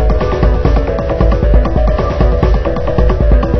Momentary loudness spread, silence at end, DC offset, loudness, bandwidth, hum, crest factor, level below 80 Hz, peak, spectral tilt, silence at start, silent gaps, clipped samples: 3 LU; 0 s; 4%; -13 LUFS; 6 kHz; none; 10 dB; -12 dBFS; 0 dBFS; -9 dB/octave; 0 s; none; 0.1%